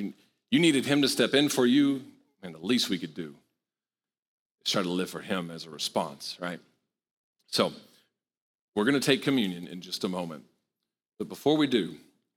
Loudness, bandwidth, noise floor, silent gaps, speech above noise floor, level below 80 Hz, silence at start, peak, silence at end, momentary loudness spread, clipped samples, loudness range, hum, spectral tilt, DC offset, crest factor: -27 LUFS; 17.5 kHz; under -90 dBFS; 4.19-4.55 s, 7.11-7.33 s, 8.37-8.72 s; over 63 dB; -74 dBFS; 0 s; -8 dBFS; 0.4 s; 16 LU; under 0.1%; 8 LU; none; -4 dB/octave; under 0.1%; 20 dB